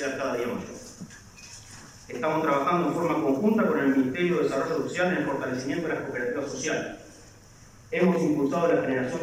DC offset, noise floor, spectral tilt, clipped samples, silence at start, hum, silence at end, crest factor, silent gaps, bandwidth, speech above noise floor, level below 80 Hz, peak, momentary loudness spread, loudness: under 0.1%; -51 dBFS; -6 dB/octave; under 0.1%; 0 s; none; 0 s; 16 dB; none; 16 kHz; 25 dB; -60 dBFS; -10 dBFS; 20 LU; -26 LUFS